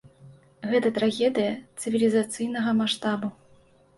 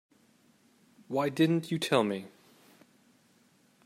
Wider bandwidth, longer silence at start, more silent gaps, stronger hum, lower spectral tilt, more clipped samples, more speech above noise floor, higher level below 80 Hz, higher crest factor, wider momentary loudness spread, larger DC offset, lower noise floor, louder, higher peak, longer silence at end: second, 11.5 kHz vs 15 kHz; second, 0.2 s vs 1.1 s; neither; neither; second, -4.5 dB/octave vs -6 dB/octave; neither; second, 33 dB vs 37 dB; first, -68 dBFS vs -78 dBFS; second, 16 dB vs 24 dB; about the same, 9 LU vs 11 LU; neither; second, -57 dBFS vs -66 dBFS; first, -25 LUFS vs -30 LUFS; about the same, -10 dBFS vs -10 dBFS; second, 0.65 s vs 1.6 s